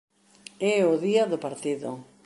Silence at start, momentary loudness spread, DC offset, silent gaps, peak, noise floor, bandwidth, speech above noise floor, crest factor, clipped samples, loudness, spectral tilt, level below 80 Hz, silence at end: 0.6 s; 10 LU; under 0.1%; none; -10 dBFS; -51 dBFS; 11.5 kHz; 26 dB; 18 dB; under 0.1%; -25 LUFS; -5 dB/octave; -76 dBFS; 0.2 s